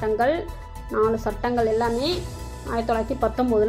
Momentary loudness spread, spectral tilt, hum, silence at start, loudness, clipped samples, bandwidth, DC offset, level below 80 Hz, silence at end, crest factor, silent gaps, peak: 12 LU; -6 dB/octave; none; 0 s; -24 LUFS; under 0.1%; 15.5 kHz; under 0.1%; -38 dBFS; 0 s; 14 dB; none; -10 dBFS